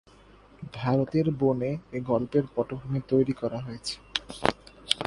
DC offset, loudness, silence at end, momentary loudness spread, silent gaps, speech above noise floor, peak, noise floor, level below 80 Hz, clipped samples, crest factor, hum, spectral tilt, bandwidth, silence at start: under 0.1%; -28 LUFS; 0 s; 9 LU; none; 27 dB; 0 dBFS; -54 dBFS; -54 dBFS; under 0.1%; 28 dB; none; -6 dB/octave; 11.5 kHz; 0.6 s